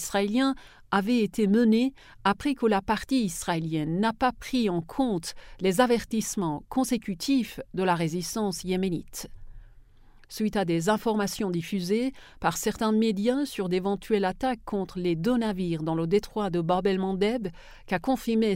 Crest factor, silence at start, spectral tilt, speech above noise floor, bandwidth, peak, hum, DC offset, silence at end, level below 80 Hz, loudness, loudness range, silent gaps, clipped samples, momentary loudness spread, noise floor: 18 dB; 0 s; -5.5 dB/octave; 26 dB; 16 kHz; -8 dBFS; none; under 0.1%; 0 s; -50 dBFS; -27 LUFS; 4 LU; none; under 0.1%; 6 LU; -53 dBFS